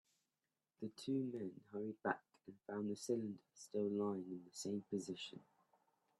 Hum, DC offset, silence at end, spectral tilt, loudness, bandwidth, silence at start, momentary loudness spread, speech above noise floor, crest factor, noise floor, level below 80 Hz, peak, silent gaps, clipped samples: none; under 0.1%; 0.8 s; -5.5 dB/octave; -45 LUFS; 12.5 kHz; 0.8 s; 11 LU; over 45 dB; 24 dB; under -90 dBFS; -88 dBFS; -22 dBFS; none; under 0.1%